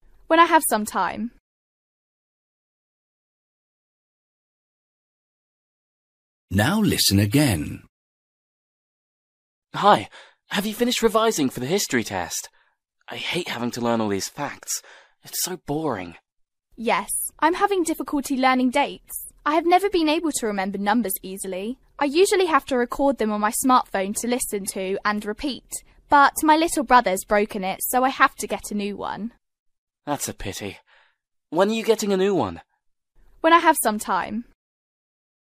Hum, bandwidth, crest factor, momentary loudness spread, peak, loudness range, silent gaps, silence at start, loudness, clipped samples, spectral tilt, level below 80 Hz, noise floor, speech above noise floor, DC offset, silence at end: none; 15.5 kHz; 22 dB; 14 LU; 0 dBFS; 7 LU; 1.40-6.48 s, 7.89-9.62 s, 29.59-29.66 s, 29.78-29.87 s; 0.3 s; -22 LUFS; under 0.1%; -4 dB/octave; -52 dBFS; -70 dBFS; 48 dB; under 0.1%; 1 s